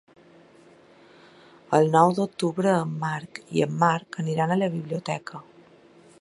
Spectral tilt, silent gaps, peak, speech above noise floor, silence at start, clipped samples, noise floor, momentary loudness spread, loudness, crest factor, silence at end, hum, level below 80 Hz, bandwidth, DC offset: -6.5 dB/octave; none; -4 dBFS; 30 dB; 1.7 s; under 0.1%; -53 dBFS; 12 LU; -24 LUFS; 22 dB; 0.8 s; none; -70 dBFS; 11.5 kHz; under 0.1%